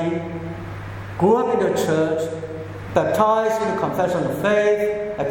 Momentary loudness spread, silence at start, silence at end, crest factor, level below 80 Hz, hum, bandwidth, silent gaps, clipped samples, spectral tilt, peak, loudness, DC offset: 14 LU; 0 s; 0 s; 18 dB; -48 dBFS; none; 17.5 kHz; none; under 0.1%; -6 dB/octave; -2 dBFS; -20 LUFS; under 0.1%